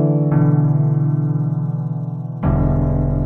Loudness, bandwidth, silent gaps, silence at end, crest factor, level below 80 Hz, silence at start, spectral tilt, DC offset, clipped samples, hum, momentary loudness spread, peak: -18 LUFS; 2.5 kHz; none; 0 s; 12 dB; -28 dBFS; 0 s; -13 dB/octave; under 0.1%; under 0.1%; none; 8 LU; -4 dBFS